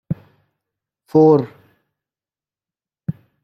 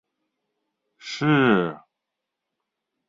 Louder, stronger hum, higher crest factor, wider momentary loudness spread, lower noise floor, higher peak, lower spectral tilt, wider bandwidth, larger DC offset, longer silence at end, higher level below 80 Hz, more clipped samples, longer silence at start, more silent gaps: first, -15 LUFS vs -21 LUFS; neither; about the same, 20 dB vs 22 dB; about the same, 18 LU vs 17 LU; first, under -90 dBFS vs -83 dBFS; first, -2 dBFS vs -6 dBFS; first, -10.5 dB/octave vs -6.5 dB/octave; second, 6 kHz vs 7.8 kHz; neither; second, 0.35 s vs 1.3 s; first, -58 dBFS vs -64 dBFS; neither; second, 0.1 s vs 1.05 s; neither